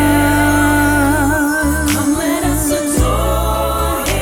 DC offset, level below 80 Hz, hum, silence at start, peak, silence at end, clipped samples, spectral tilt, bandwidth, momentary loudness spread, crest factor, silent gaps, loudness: under 0.1%; -22 dBFS; none; 0 s; -2 dBFS; 0 s; under 0.1%; -4.5 dB/octave; 17.5 kHz; 4 LU; 12 dB; none; -14 LUFS